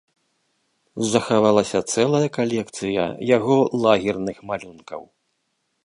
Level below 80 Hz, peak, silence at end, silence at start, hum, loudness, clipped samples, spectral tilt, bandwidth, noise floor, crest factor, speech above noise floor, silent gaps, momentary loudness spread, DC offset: -58 dBFS; -2 dBFS; 0.85 s; 0.95 s; none; -21 LUFS; under 0.1%; -5 dB/octave; 11.5 kHz; -73 dBFS; 20 dB; 52 dB; none; 17 LU; under 0.1%